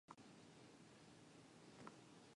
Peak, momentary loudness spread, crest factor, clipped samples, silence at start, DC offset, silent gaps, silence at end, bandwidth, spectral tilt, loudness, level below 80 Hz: -42 dBFS; 4 LU; 22 dB; under 0.1%; 0.1 s; under 0.1%; none; 0 s; 11 kHz; -4.5 dB/octave; -64 LUFS; -88 dBFS